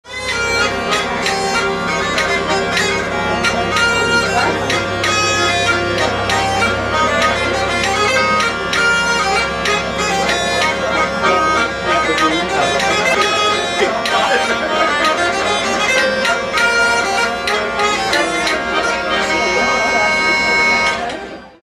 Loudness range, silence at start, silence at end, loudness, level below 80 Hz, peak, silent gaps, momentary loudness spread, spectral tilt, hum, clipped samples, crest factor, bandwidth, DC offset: 1 LU; 0.05 s; 0.15 s; -14 LUFS; -38 dBFS; -2 dBFS; none; 4 LU; -2.5 dB/octave; none; under 0.1%; 14 dB; 14 kHz; under 0.1%